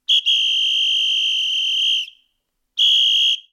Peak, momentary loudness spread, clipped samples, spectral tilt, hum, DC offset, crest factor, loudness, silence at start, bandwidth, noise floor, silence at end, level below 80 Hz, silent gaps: -8 dBFS; 6 LU; under 0.1%; 9 dB/octave; none; under 0.1%; 10 dB; -15 LUFS; 0.1 s; 15 kHz; -72 dBFS; 0.1 s; -76 dBFS; none